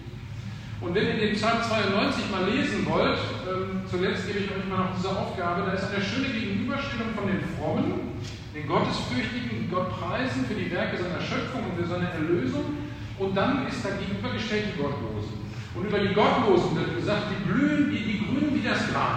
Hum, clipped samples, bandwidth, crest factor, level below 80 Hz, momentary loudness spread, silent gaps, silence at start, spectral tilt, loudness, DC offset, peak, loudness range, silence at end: none; under 0.1%; 9.6 kHz; 18 dB; -48 dBFS; 9 LU; none; 0 s; -6 dB/octave; -27 LUFS; under 0.1%; -10 dBFS; 4 LU; 0 s